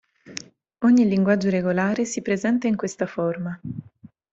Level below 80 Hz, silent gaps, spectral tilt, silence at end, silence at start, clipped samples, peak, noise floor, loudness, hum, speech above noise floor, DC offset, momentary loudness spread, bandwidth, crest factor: -62 dBFS; none; -6.5 dB/octave; 0.5 s; 0.3 s; under 0.1%; -6 dBFS; -50 dBFS; -22 LUFS; none; 29 dB; under 0.1%; 19 LU; 8 kHz; 16 dB